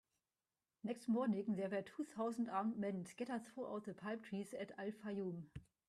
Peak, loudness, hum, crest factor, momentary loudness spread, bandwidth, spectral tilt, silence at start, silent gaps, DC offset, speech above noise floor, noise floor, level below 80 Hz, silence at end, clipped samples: -28 dBFS; -44 LUFS; none; 18 dB; 9 LU; 13 kHz; -7 dB/octave; 0.85 s; none; under 0.1%; over 46 dB; under -90 dBFS; -78 dBFS; 0.25 s; under 0.1%